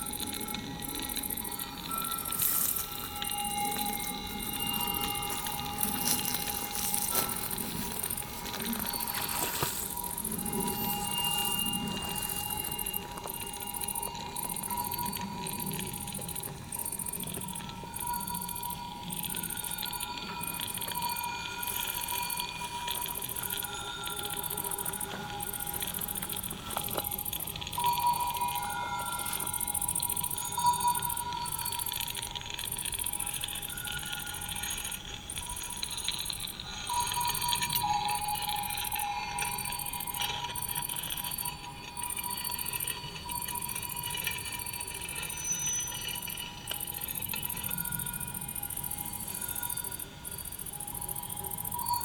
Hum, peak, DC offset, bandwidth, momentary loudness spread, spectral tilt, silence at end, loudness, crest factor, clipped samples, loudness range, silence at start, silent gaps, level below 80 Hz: none; -10 dBFS; under 0.1%; over 20 kHz; 7 LU; -1.5 dB/octave; 0 s; -33 LUFS; 26 dB; under 0.1%; 4 LU; 0 s; none; -54 dBFS